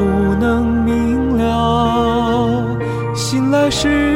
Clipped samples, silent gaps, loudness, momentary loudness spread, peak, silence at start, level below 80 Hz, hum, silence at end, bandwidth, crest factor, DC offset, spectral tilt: under 0.1%; none; -16 LUFS; 5 LU; -4 dBFS; 0 s; -28 dBFS; none; 0 s; 16 kHz; 12 dB; under 0.1%; -6 dB/octave